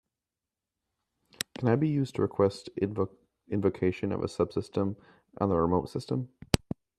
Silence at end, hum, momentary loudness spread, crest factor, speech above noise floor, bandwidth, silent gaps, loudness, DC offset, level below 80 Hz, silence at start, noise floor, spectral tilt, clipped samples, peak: 0.4 s; none; 8 LU; 28 dB; 61 dB; 13.5 kHz; none; -30 LUFS; under 0.1%; -54 dBFS; 1.6 s; -90 dBFS; -6.5 dB/octave; under 0.1%; -4 dBFS